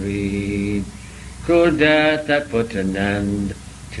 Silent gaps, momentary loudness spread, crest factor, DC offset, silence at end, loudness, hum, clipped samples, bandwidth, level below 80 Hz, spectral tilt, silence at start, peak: none; 19 LU; 18 dB; under 0.1%; 0 s; -19 LUFS; none; under 0.1%; 12 kHz; -38 dBFS; -6 dB/octave; 0 s; 0 dBFS